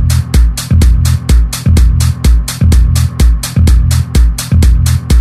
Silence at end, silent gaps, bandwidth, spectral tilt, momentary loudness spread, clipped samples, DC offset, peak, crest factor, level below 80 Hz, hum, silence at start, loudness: 0 s; none; 14.5 kHz; -5.5 dB/octave; 3 LU; 0.2%; under 0.1%; 0 dBFS; 8 dB; -10 dBFS; none; 0 s; -10 LUFS